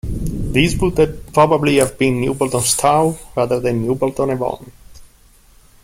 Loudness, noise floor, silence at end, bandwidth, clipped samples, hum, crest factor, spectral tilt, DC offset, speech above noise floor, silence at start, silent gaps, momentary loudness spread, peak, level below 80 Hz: -17 LUFS; -49 dBFS; 0.8 s; 16.5 kHz; under 0.1%; none; 16 dB; -5 dB/octave; under 0.1%; 33 dB; 0.05 s; none; 8 LU; 0 dBFS; -32 dBFS